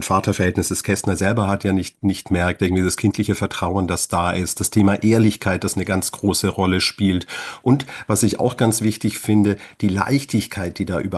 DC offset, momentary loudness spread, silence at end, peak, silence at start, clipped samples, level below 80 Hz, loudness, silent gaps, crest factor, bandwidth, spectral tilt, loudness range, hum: under 0.1%; 6 LU; 0 s; -2 dBFS; 0 s; under 0.1%; -46 dBFS; -20 LUFS; none; 16 dB; 13 kHz; -5 dB/octave; 1 LU; none